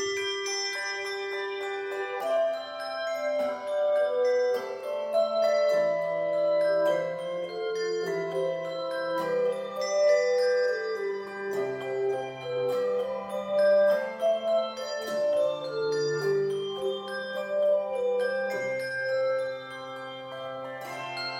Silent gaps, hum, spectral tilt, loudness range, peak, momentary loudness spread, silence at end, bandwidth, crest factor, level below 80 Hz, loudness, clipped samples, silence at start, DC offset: none; none; -3.5 dB/octave; 4 LU; -14 dBFS; 9 LU; 0 s; 16 kHz; 14 dB; -78 dBFS; -28 LUFS; under 0.1%; 0 s; under 0.1%